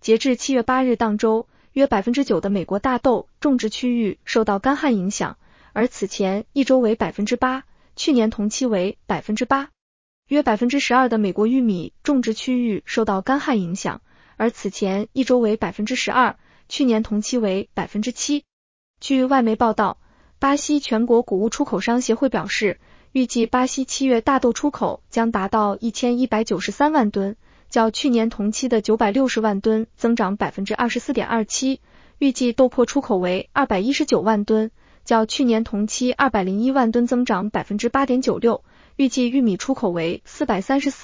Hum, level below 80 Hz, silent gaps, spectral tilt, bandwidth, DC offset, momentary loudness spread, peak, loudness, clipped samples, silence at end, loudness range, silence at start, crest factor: none; -50 dBFS; 9.81-10.23 s, 18.53-18.94 s; -4.5 dB/octave; 7.6 kHz; under 0.1%; 7 LU; -4 dBFS; -20 LUFS; under 0.1%; 0 s; 2 LU; 0.05 s; 16 dB